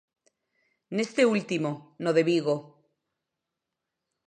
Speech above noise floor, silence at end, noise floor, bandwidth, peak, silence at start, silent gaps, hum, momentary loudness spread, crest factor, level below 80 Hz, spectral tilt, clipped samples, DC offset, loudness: 60 dB; 1.65 s; -86 dBFS; 9.8 kHz; -10 dBFS; 0.9 s; none; none; 9 LU; 20 dB; -80 dBFS; -5.5 dB/octave; under 0.1%; under 0.1%; -27 LUFS